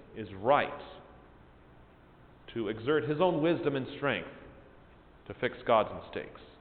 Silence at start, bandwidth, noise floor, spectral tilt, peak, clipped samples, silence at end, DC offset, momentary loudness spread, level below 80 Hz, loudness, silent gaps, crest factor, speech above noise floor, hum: 0 s; 4.6 kHz; -57 dBFS; -9.5 dB/octave; -12 dBFS; under 0.1%; 0.1 s; under 0.1%; 20 LU; -60 dBFS; -31 LUFS; none; 22 dB; 26 dB; none